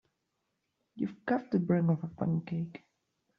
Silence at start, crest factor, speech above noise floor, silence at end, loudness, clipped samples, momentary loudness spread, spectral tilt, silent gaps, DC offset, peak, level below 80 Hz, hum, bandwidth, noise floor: 0.95 s; 18 dB; 51 dB; 0.6 s; -33 LUFS; under 0.1%; 10 LU; -9 dB/octave; none; under 0.1%; -16 dBFS; -72 dBFS; none; 5.2 kHz; -82 dBFS